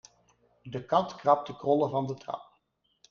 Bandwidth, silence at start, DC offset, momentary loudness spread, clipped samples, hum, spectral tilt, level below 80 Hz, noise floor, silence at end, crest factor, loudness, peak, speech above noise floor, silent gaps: 7 kHz; 0.65 s; under 0.1%; 14 LU; under 0.1%; none; -7 dB/octave; -70 dBFS; -74 dBFS; 0.7 s; 22 dB; -29 LUFS; -8 dBFS; 46 dB; none